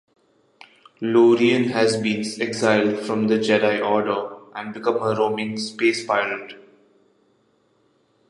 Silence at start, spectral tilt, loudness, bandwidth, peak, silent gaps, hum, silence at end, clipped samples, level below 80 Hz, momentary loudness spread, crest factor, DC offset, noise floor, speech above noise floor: 1 s; -5 dB/octave; -21 LUFS; 11.5 kHz; -2 dBFS; none; none; 1.7 s; under 0.1%; -68 dBFS; 11 LU; 20 dB; under 0.1%; -63 dBFS; 43 dB